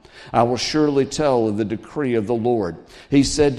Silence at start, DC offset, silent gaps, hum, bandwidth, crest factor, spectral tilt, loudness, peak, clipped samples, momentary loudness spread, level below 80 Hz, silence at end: 0.15 s; under 0.1%; none; none; 12 kHz; 18 dB; -5.5 dB/octave; -20 LUFS; -2 dBFS; under 0.1%; 7 LU; -42 dBFS; 0 s